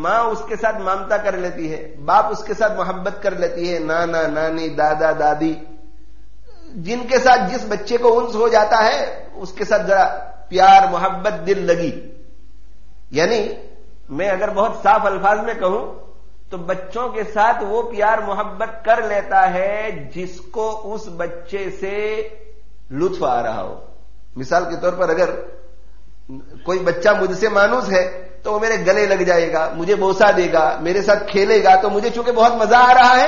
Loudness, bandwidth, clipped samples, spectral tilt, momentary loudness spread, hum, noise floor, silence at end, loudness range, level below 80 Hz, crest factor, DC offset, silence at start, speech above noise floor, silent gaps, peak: -17 LUFS; 7.2 kHz; under 0.1%; -2.5 dB/octave; 15 LU; none; -45 dBFS; 0 s; 8 LU; -44 dBFS; 16 dB; 4%; 0 s; 28 dB; none; -2 dBFS